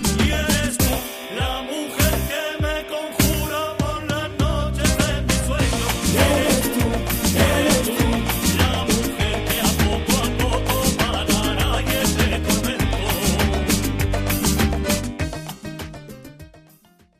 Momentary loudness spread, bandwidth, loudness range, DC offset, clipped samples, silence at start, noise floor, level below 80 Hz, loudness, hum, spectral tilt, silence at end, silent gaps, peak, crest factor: 8 LU; 15.5 kHz; 4 LU; under 0.1%; under 0.1%; 0 s; -54 dBFS; -28 dBFS; -20 LUFS; none; -4 dB/octave; 0.6 s; none; -2 dBFS; 18 dB